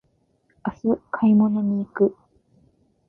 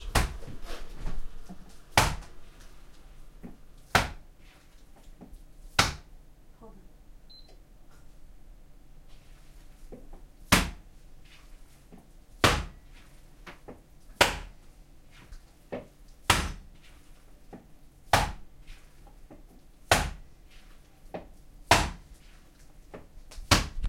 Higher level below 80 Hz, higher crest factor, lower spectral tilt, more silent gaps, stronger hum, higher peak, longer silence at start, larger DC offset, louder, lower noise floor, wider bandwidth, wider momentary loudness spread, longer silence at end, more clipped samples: second, -60 dBFS vs -42 dBFS; second, 16 dB vs 28 dB; first, -11 dB/octave vs -3 dB/octave; neither; neither; about the same, -6 dBFS vs -4 dBFS; first, 0.65 s vs 0 s; neither; first, -22 LUFS vs -28 LUFS; first, -66 dBFS vs -52 dBFS; second, 3.1 kHz vs 16.5 kHz; second, 11 LU vs 27 LU; first, 0.95 s vs 0 s; neither